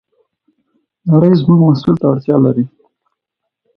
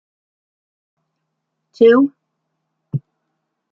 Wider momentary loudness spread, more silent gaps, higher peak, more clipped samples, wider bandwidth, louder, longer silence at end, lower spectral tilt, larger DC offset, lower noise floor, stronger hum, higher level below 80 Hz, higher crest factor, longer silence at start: second, 10 LU vs 16 LU; neither; about the same, 0 dBFS vs -2 dBFS; neither; about the same, 5.6 kHz vs 5.6 kHz; about the same, -12 LUFS vs -13 LUFS; first, 1.1 s vs 0.75 s; first, -11 dB/octave vs -9 dB/octave; neither; about the same, -77 dBFS vs -75 dBFS; neither; first, -50 dBFS vs -70 dBFS; about the same, 14 dB vs 18 dB; second, 1.05 s vs 1.8 s